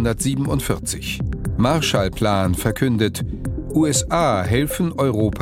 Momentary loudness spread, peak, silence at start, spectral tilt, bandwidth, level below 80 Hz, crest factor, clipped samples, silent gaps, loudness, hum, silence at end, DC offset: 7 LU; -2 dBFS; 0 s; -5 dB/octave; 16.5 kHz; -34 dBFS; 18 dB; under 0.1%; none; -20 LUFS; none; 0 s; under 0.1%